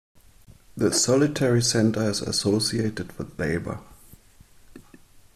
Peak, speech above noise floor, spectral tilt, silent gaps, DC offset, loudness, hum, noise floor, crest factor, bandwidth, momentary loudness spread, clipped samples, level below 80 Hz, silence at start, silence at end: -8 dBFS; 30 dB; -4.5 dB/octave; none; under 0.1%; -23 LUFS; none; -53 dBFS; 18 dB; 14.5 kHz; 15 LU; under 0.1%; -52 dBFS; 0.75 s; 0.55 s